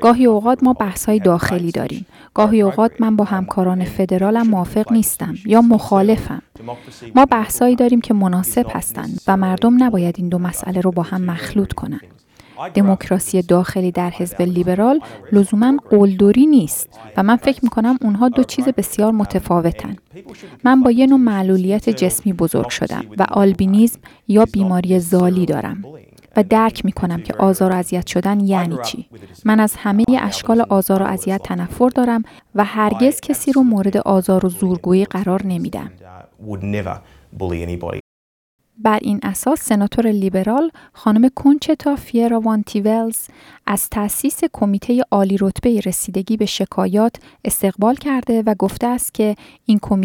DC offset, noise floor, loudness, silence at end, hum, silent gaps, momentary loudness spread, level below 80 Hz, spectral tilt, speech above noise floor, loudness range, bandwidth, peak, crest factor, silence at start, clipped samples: under 0.1%; under -90 dBFS; -16 LUFS; 0 s; none; 38.00-38.59 s; 10 LU; -44 dBFS; -6 dB/octave; over 74 dB; 4 LU; 18 kHz; -2 dBFS; 14 dB; 0 s; under 0.1%